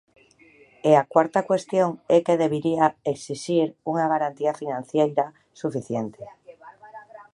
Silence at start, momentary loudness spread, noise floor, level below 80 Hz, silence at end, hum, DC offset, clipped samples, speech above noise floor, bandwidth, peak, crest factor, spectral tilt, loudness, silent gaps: 0.85 s; 13 LU; -55 dBFS; -70 dBFS; 0.1 s; none; under 0.1%; under 0.1%; 32 dB; 11.5 kHz; -4 dBFS; 20 dB; -6.5 dB/octave; -23 LUFS; none